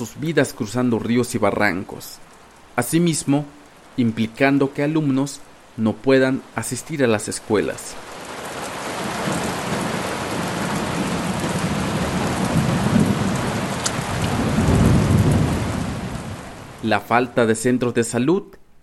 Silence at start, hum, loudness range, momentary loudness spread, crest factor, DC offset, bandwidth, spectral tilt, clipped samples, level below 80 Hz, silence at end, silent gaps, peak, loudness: 0 s; none; 5 LU; 12 LU; 20 dB; under 0.1%; 16.5 kHz; -5.5 dB/octave; under 0.1%; -38 dBFS; 0.2 s; none; -2 dBFS; -21 LUFS